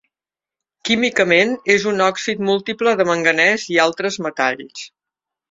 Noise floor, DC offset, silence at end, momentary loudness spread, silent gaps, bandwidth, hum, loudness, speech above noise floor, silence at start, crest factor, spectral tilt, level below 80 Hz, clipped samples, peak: -90 dBFS; under 0.1%; 0.65 s; 13 LU; none; 7.8 kHz; none; -17 LUFS; 73 dB; 0.85 s; 18 dB; -3.5 dB/octave; -62 dBFS; under 0.1%; -2 dBFS